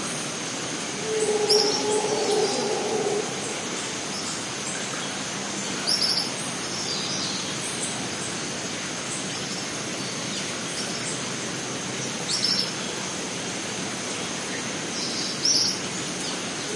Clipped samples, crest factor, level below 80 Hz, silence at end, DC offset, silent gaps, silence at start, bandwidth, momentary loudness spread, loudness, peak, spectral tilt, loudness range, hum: under 0.1%; 20 dB; -64 dBFS; 0 s; under 0.1%; none; 0 s; 11.5 kHz; 8 LU; -26 LUFS; -6 dBFS; -2 dB/octave; 5 LU; none